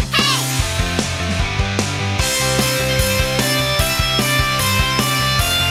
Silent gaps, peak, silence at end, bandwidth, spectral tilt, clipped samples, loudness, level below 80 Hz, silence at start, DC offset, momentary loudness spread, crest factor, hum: none; -2 dBFS; 0 s; 16.5 kHz; -3 dB/octave; under 0.1%; -16 LUFS; -28 dBFS; 0 s; under 0.1%; 4 LU; 14 dB; none